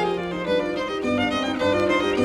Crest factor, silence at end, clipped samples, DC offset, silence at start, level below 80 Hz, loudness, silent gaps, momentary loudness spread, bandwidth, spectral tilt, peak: 16 dB; 0 s; under 0.1%; under 0.1%; 0 s; -50 dBFS; -23 LUFS; none; 5 LU; 12.5 kHz; -5 dB/octave; -8 dBFS